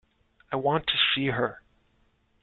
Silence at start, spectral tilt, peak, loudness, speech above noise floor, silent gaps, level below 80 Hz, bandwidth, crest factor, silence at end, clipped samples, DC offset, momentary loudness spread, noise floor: 0.5 s; -8.5 dB/octave; -10 dBFS; -26 LUFS; 41 dB; none; -58 dBFS; 4.6 kHz; 20 dB; 0.85 s; under 0.1%; under 0.1%; 9 LU; -67 dBFS